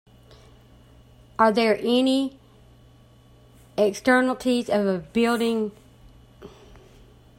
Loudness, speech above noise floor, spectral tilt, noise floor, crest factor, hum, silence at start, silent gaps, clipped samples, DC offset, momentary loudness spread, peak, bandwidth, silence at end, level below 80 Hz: -22 LUFS; 31 dB; -5 dB/octave; -53 dBFS; 20 dB; none; 1.4 s; none; under 0.1%; under 0.1%; 11 LU; -4 dBFS; 16 kHz; 0.9 s; -56 dBFS